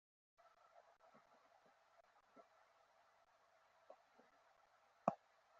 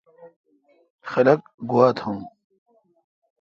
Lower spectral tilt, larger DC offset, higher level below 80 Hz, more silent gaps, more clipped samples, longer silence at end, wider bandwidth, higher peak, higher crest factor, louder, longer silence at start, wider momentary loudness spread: second, -6 dB/octave vs -8 dB/octave; neither; second, under -90 dBFS vs -66 dBFS; second, none vs 0.36-0.44 s, 0.90-0.99 s, 1.54-1.58 s; neither; second, 0.45 s vs 1.15 s; about the same, 7.2 kHz vs 7 kHz; second, -20 dBFS vs -4 dBFS; first, 36 dB vs 22 dB; second, -46 LUFS vs -21 LUFS; first, 2.35 s vs 0.25 s; first, 24 LU vs 19 LU